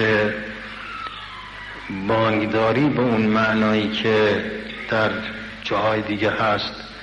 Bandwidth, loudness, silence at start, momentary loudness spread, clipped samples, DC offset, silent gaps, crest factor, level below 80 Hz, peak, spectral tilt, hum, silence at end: 9 kHz; -21 LUFS; 0 s; 13 LU; under 0.1%; under 0.1%; none; 14 dB; -48 dBFS; -8 dBFS; -6.5 dB/octave; none; 0 s